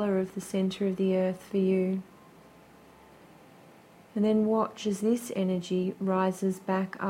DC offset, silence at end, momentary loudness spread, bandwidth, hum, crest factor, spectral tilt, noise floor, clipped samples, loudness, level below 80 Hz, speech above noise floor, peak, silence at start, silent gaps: under 0.1%; 0 s; 5 LU; 15.5 kHz; none; 16 dB; -7 dB/octave; -55 dBFS; under 0.1%; -29 LUFS; -70 dBFS; 27 dB; -14 dBFS; 0 s; none